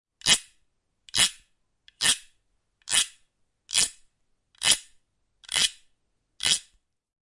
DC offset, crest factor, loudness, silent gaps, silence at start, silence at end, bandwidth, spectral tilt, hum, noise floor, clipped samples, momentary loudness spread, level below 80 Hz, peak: under 0.1%; 26 dB; -24 LUFS; none; 0.25 s; 0.7 s; 11.5 kHz; 1.5 dB/octave; none; -73 dBFS; under 0.1%; 7 LU; -60 dBFS; -4 dBFS